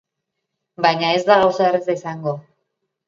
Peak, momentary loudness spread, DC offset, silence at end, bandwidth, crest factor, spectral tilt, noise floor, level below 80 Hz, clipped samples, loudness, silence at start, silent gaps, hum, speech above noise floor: -2 dBFS; 12 LU; under 0.1%; 0.65 s; 7.6 kHz; 18 dB; -5.5 dB/octave; -79 dBFS; -64 dBFS; under 0.1%; -18 LUFS; 0.8 s; none; none; 61 dB